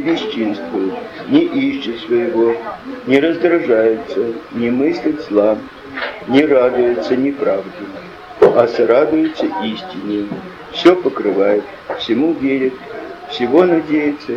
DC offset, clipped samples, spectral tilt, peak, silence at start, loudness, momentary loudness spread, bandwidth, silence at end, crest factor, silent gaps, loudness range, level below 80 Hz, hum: under 0.1%; under 0.1%; -6.5 dB/octave; 0 dBFS; 0 s; -16 LUFS; 14 LU; 7.4 kHz; 0 s; 16 dB; none; 2 LU; -54 dBFS; none